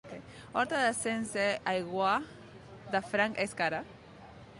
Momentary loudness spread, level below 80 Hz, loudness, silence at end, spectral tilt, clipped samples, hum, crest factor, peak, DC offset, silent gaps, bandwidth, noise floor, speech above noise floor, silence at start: 21 LU; -64 dBFS; -32 LUFS; 0 s; -3.5 dB/octave; under 0.1%; none; 18 dB; -16 dBFS; under 0.1%; none; 11.5 kHz; -52 dBFS; 20 dB; 0.05 s